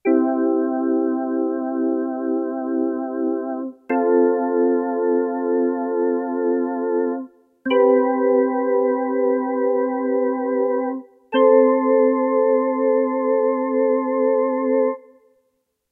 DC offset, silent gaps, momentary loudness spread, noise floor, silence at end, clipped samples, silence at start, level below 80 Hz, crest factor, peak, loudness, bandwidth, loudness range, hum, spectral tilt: under 0.1%; none; 7 LU; -70 dBFS; 0.9 s; under 0.1%; 0.05 s; -82 dBFS; 16 dB; -4 dBFS; -20 LUFS; 3.4 kHz; 4 LU; none; -8 dB/octave